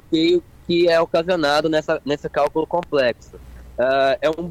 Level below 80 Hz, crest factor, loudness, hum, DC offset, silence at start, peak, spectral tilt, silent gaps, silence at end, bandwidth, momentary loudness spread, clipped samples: -46 dBFS; 12 dB; -19 LUFS; none; under 0.1%; 0.1 s; -8 dBFS; -5.5 dB/octave; none; 0 s; 13.5 kHz; 6 LU; under 0.1%